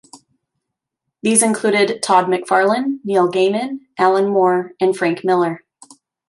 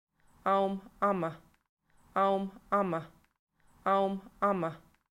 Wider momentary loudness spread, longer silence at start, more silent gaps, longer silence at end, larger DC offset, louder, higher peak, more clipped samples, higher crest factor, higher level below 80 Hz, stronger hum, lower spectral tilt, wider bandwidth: about the same, 7 LU vs 8 LU; second, 0.15 s vs 0.45 s; second, none vs 1.69-1.77 s, 3.39-3.47 s; first, 0.7 s vs 0.35 s; neither; first, -16 LUFS vs -32 LUFS; first, 0 dBFS vs -16 dBFS; neither; about the same, 18 dB vs 16 dB; about the same, -70 dBFS vs -68 dBFS; neither; second, -4 dB/octave vs -7.5 dB/octave; second, 11.5 kHz vs 13 kHz